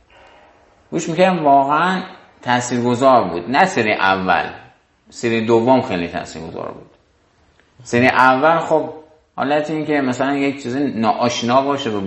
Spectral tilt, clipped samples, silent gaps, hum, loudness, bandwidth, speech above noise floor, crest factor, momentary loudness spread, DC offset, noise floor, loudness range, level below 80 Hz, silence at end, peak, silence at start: -5 dB/octave; under 0.1%; none; none; -16 LUFS; 8.6 kHz; 40 dB; 18 dB; 15 LU; under 0.1%; -57 dBFS; 4 LU; -52 dBFS; 0 s; 0 dBFS; 0.9 s